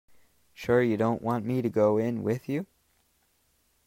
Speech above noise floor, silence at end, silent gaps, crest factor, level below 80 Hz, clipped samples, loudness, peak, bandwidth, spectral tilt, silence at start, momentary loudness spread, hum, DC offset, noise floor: 43 dB; 1.2 s; none; 18 dB; -64 dBFS; under 0.1%; -27 LUFS; -12 dBFS; 16 kHz; -8 dB/octave; 0.6 s; 10 LU; none; under 0.1%; -70 dBFS